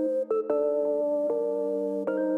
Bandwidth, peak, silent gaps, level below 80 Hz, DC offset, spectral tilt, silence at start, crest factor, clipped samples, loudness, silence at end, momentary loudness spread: 3 kHz; -16 dBFS; none; -86 dBFS; under 0.1%; -8.5 dB/octave; 0 s; 12 dB; under 0.1%; -27 LUFS; 0 s; 3 LU